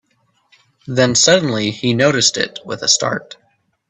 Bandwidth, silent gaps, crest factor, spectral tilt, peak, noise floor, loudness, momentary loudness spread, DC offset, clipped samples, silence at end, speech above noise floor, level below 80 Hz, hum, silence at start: 8.6 kHz; none; 18 dB; -3 dB/octave; 0 dBFS; -62 dBFS; -14 LUFS; 11 LU; under 0.1%; under 0.1%; 0.65 s; 46 dB; -56 dBFS; none; 0.85 s